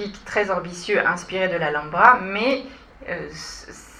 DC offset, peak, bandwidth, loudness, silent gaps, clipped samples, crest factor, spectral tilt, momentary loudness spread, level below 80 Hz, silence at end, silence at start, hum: under 0.1%; 0 dBFS; 13 kHz; -21 LUFS; none; under 0.1%; 22 dB; -4 dB/octave; 20 LU; -50 dBFS; 0 s; 0 s; none